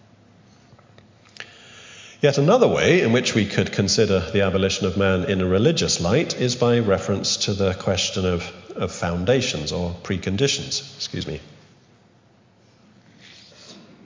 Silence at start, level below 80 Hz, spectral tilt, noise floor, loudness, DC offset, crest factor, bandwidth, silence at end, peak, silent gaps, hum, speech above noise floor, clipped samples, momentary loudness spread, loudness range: 1.4 s; -42 dBFS; -4.5 dB/octave; -56 dBFS; -21 LUFS; under 0.1%; 20 dB; 7.6 kHz; 0.25 s; -2 dBFS; none; none; 35 dB; under 0.1%; 13 LU; 9 LU